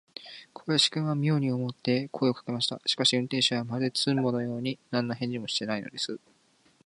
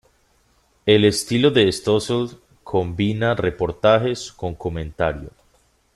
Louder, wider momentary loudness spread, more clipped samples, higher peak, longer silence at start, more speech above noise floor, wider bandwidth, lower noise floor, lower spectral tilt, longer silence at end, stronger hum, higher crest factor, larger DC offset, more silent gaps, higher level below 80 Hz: second, -28 LUFS vs -20 LUFS; about the same, 10 LU vs 12 LU; neither; second, -10 dBFS vs -2 dBFS; second, 0.2 s vs 0.85 s; second, 36 dB vs 41 dB; second, 11.5 kHz vs 13 kHz; first, -65 dBFS vs -61 dBFS; about the same, -4.5 dB/octave vs -5.5 dB/octave; about the same, 0.7 s vs 0.65 s; neither; about the same, 20 dB vs 18 dB; neither; neither; second, -72 dBFS vs -46 dBFS